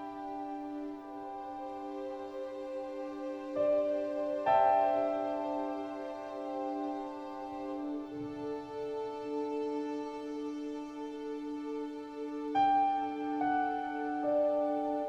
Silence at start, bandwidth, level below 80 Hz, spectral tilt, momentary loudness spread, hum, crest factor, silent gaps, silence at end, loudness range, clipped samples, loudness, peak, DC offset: 0 s; 8.4 kHz; -70 dBFS; -6 dB/octave; 13 LU; none; 18 dB; none; 0 s; 7 LU; under 0.1%; -35 LUFS; -16 dBFS; under 0.1%